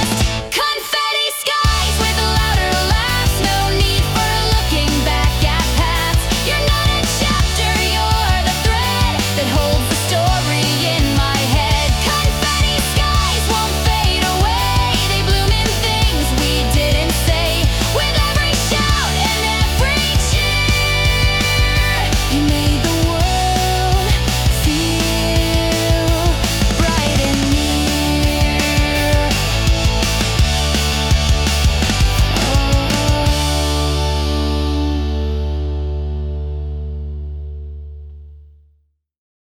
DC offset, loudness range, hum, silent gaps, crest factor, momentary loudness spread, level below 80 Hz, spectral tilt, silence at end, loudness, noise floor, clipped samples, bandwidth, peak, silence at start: under 0.1%; 3 LU; none; none; 12 dB; 4 LU; -20 dBFS; -4 dB/octave; 1 s; -15 LUFS; -60 dBFS; under 0.1%; over 20 kHz; -4 dBFS; 0 s